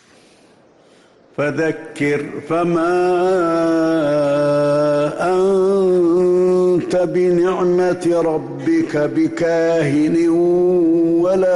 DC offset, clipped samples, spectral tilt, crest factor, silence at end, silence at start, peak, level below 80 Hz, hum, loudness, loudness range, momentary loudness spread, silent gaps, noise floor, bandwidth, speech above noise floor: under 0.1%; under 0.1%; -7 dB/octave; 8 dB; 0 s; 1.4 s; -8 dBFS; -54 dBFS; none; -16 LUFS; 3 LU; 5 LU; none; -50 dBFS; 11.5 kHz; 34 dB